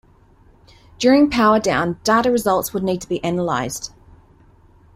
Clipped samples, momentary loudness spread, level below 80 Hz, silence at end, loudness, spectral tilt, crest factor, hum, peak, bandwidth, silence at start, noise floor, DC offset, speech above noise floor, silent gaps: under 0.1%; 9 LU; -48 dBFS; 1.1 s; -18 LUFS; -5 dB/octave; 16 dB; none; -2 dBFS; 16 kHz; 1 s; -51 dBFS; under 0.1%; 34 dB; none